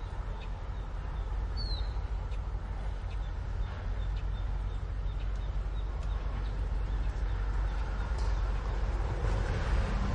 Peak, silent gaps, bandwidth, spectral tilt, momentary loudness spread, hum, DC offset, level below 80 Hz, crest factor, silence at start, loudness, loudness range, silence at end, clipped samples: -18 dBFS; none; 7.8 kHz; -6.5 dB/octave; 6 LU; none; under 0.1%; -34 dBFS; 14 dB; 0 s; -36 LUFS; 3 LU; 0 s; under 0.1%